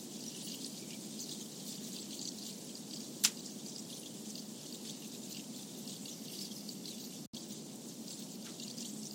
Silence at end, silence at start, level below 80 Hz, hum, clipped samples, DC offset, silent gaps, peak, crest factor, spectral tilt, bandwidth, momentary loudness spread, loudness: 0 s; 0 s; -86 dBFS; none; under 0.1%; under 0.1%; 7.27-7.33 s; -8 dBFS; 38 dB; -2 dB/octave; 16.5 kHz; 4 LU; -43 LUFS